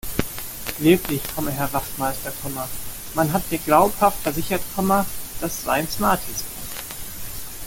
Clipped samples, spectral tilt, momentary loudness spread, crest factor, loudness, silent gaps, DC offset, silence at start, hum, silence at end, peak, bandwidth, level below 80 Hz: under 0.1%; -4.5 dB/octave; 13 LU; 20 dB; -23 LUFS; none; under 0.1%; 0.05 s; none; 0 s; -2 dBFS; 17 kHz; -40 dBFS